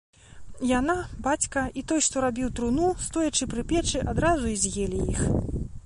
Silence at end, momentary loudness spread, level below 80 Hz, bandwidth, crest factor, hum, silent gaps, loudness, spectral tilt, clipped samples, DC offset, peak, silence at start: 0.05 s; 4 LU; -38 dBFS; 11.5 kHz; 16 dB; none; none; -26 LUFS; -4 dB/octave; under 0.1%; under 0.1%; -10 dBFS; 0.3 s